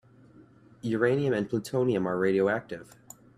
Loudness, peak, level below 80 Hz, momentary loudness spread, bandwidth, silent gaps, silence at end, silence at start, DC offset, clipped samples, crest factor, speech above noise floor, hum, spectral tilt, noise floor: -28 LUFS; -10 dBFS; -66 dBFS; 16 LU; 14 kHz; none; 0.55 s; 0.85 s; under 0.1%; under 0.1%; 20 dB; 28 dB; none; -7 dB/octave; -55 dBFS